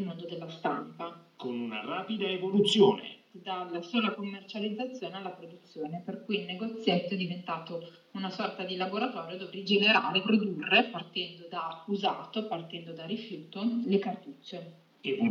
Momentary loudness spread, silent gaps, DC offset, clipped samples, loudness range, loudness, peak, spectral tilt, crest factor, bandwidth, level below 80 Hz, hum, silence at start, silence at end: 17 LU; none; under 0.1%; under 0.1%; 7 LU; -31 LUFS; -10 dBFS; -5.5 dB/octave; 22 dB; 11 kHz; -90 dBFS; none; 0 s; 0 s